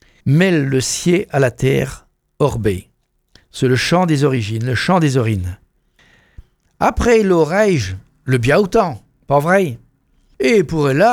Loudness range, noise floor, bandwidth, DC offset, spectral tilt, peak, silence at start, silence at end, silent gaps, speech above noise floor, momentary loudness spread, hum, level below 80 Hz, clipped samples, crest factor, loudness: 3 LU; -56 dBFS; 16.5 kHz; under 0.1%; -6 dB/octave; 0 dBFS; 0.25 s; 0 s; none; 41 dB; 10 LU; none; -38 dBFS; under 0.1%; 16 dB; -16 LUFS